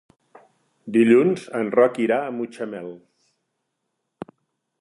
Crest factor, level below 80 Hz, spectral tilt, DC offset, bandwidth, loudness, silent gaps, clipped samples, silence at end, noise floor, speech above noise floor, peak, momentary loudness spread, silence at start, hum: 20 dB; -72 dBFS; -7 dB/octave; under 0.1%; 11.5 kHz; -20 LUFS; none; under 0.1%; 1.85 s; -78 dBFS; 58 dB; -4 dBFS; 25 LU; 0.85 s; none